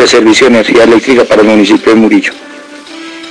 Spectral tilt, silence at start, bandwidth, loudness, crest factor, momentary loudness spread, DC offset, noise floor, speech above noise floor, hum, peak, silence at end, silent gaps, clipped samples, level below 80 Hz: -4 dB/octave; 0 s; 10.5 kHz; -5 LUFS; 6 dB; 20 LU; under 0.1%; -27 dBFS; 22 dB; none; 0 dBFS; 0 s; none; under 0.1%; -42 dBFS